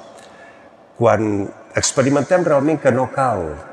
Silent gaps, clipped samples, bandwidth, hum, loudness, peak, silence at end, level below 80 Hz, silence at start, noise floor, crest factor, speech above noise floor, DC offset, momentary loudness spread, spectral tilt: none; under 0.1%; 11 kHz; none; -17 LUFS; -2 dBFS; 0 s; -52 dBFS; 0 s; -45 dBFS; 16 dB; 28 dB; under 0.1%; 7 LU; -5 dB/octave